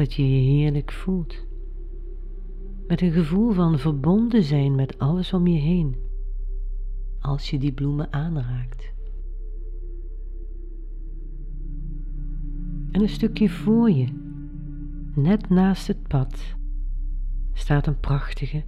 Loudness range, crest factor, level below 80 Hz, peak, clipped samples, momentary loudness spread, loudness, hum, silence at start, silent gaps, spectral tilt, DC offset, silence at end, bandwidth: 14 LU; 16 dB; -30 dBFS; -8 dBFS; under 0.1%; 19 LU; -23 LUFS; none; 0 s; none; -9 dB/octave; under 0.1%; 0 s; 8.8 kHz